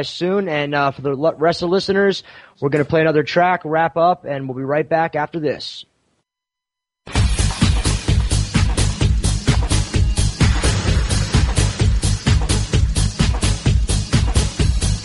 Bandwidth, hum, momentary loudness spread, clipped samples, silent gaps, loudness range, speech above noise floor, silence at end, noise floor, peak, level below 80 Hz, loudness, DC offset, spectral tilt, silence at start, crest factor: 11.5 kHz; none; 5 LU; under 0.1%; none; 4 LU; 66 dB; 0 s; -84 dBFS; -2 dBFS; -22 dBFS; -18 LUFS; under 0.1%; -5 dB/octave; 0 s; 14 dB